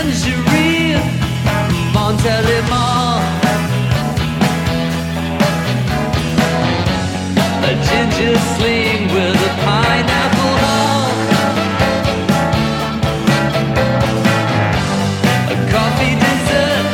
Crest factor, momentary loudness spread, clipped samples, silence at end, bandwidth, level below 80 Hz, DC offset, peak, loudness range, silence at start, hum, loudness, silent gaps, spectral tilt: 14 dB; 4 LU; under 0.1%; 0 s; 17 kHz; -32 dBFS; under 0.1%; 0 dBFS; 2 LU; 0 s; none; -14 LUFS; none; -5.5 dB/octave